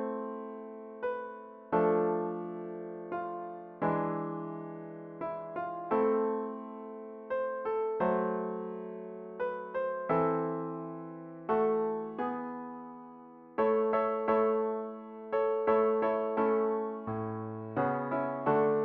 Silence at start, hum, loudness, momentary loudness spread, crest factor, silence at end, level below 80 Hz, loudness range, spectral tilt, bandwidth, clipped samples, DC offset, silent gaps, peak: 0 s; none; -33 LUFS; 15 LU; 18 dB; 0 s; -72 dBFS; 5 LU; -7 dB/octave; 4.2 kHz; under 0.1%; under 0.1%; none; -14 dBFS